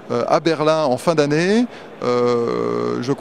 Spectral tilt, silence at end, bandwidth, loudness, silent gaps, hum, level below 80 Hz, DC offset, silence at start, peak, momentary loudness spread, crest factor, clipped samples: -6 dB/octave; 0 s; 13 kHz; -18 LUFS; none; none; -60 dBFS; 0.3%; 0 s; 0 dBFS; 5 LU; 18 dB; under 0.1%